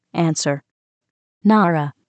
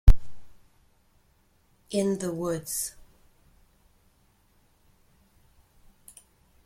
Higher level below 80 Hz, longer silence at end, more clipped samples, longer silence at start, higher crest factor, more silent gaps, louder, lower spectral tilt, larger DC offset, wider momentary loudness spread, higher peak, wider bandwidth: second, -80 dBFS vs -30 dBFS; second, 0.2 s vs 3.75 s; neither; about the same, 0.15 s vs 0.05 s; second, 16 dB vs 24 dB; first, 0.71-1.01 s, 1.10-1.41 s vs none; first, -19 LUFS vs -29 LUFS; about the same, -5.5 dB/octave vs -5.5 dB/octave; neither; second, 8 LU vs 24 LU; about the same, -4 dBFS vs -2 dBFS; second, 9.2 kHz vs 15.5 kHz